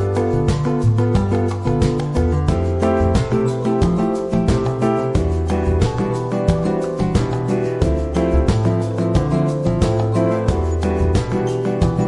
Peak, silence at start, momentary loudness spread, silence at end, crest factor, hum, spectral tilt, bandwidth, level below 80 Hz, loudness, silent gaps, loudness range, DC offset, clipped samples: -2 dBFS; 0 s; 3 LU; 0 s; 16 dB; none; -8 dB/octave; 11.5 kHz; -28 dBFS; -18 LUFS; none; 1 LU; under 0.1%; under 0.1%